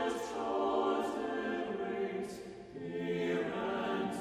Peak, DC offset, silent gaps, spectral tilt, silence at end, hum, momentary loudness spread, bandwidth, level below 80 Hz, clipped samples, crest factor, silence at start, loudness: -22 dBFS; under 0.1%; none; -5.5 dB/octave; 0 s; none; 10 LU; 15 kHz; -68 dBFS; under 0.1%; 14 dB; 0 s; -36 LUFS